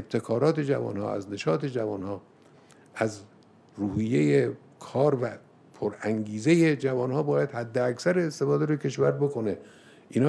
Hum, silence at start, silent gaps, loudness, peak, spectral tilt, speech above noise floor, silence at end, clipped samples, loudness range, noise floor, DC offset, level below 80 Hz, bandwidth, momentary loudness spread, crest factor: none; 0 s; none; -27 LUFS; -10 dBFS; -7 dB/octave; 29 dB; 0 s; under 0.1%; 5 LU; -55 dBFS; under 0.1%; -66 dBFS; 11 kHz; 11 LU; 18 dB